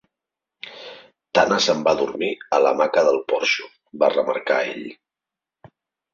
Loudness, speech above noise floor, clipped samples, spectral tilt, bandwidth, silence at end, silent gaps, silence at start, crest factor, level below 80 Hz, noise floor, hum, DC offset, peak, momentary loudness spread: -20 LUFS; 68 dB; under 0.1%; -3 dB/octave; 7.8 kHz; 1.2 s; none; 0.65 s; 20 dB; -64 dBFS; -88 dBFS; none; under 0.1%; -2 dBFS; 20 LU